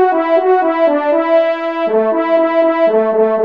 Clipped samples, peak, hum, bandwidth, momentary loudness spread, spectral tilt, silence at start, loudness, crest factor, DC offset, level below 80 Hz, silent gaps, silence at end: under 0.1%; -2 dBFS; none; 5.2 kHz; 3 LU; -7 dB/octave; 0 s; -13 LUFS; 10 dB; 0.3%; -66 dBFS; none; 0 s